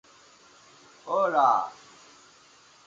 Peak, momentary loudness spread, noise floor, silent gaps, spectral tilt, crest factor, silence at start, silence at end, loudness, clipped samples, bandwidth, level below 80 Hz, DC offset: -10 dBFS; 17 LU; -56 dBFS; none; -4 dB/octave; 20 dB; 1.05 s; 1.15 s; -25 LUFS; under 0.1%; 7.8 kHz; -80 dBFS; under 0.1%